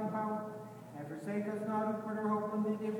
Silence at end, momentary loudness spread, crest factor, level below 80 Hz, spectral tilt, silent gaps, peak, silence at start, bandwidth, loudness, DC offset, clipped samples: 0 s; 12 LU; 14 dB; -84 dBFS; -8 dB/octave; none; -24 dBFS; 0 s; 18 kHz; -37 LUFS; under 0.1%; under 0.1%